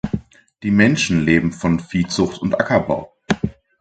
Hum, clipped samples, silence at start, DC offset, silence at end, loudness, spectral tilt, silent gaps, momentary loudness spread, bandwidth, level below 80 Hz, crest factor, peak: none; under 0.1%; 0.05 s; under 0.1%; 0.3 s; -19 LUFS; -5.5 dB/octave; none; 11 LU; 9.2 kHz; -40 dBFS; 18 dB; 0 dBFS